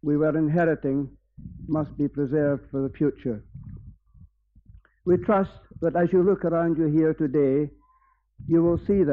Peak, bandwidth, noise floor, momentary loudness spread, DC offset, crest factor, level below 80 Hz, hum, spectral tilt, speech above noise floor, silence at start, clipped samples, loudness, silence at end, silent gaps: -10 dBFS; 4.1 kHz; -64 dBFS; 14 LU; under 0.1%; 14 dB; -50 dBFS; none; -9.5 dB/octave; 41 dB; 0.05 s; under 0.1%; -24 LUFS; 0 s; none